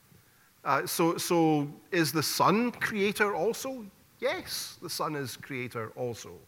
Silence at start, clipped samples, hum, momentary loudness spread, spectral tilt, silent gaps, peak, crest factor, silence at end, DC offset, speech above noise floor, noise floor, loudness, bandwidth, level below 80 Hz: 0.65 s; under 0.1%; none; 12 LU; -4 dB/octave; none; -10 dBFS; 20 dB; 0.05 s; under 0.1%; 31 dB; -61 dBFS; -30 LUFS; 17.5 kHz; -70 dBFS